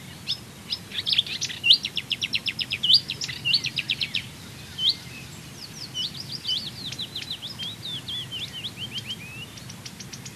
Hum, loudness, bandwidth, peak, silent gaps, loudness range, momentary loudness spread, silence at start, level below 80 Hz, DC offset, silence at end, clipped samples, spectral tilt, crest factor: none; -25 LUFS; 13.5 kHz; -4 dBFS; none; 10 LU; 20 LU; 0 s; -58 dBFS; under 0.1%; 0 s; under 0.1%; -1.5 dB/octave; 24 dB